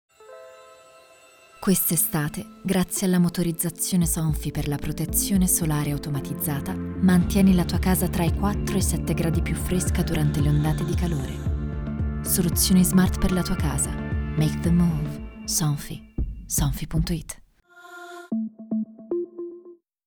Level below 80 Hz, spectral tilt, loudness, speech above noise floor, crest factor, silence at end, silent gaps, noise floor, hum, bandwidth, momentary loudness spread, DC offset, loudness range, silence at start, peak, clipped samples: -34 dBFS; -5 dB/octave; -24 LUFS; 30 dB; 16 dB; 0.3 s; none; -52 dBFS; none; over 20 kHz; 11 LU; under 0.1%; 6 LU; 0.2 s; -6 dBFS; under 0.1%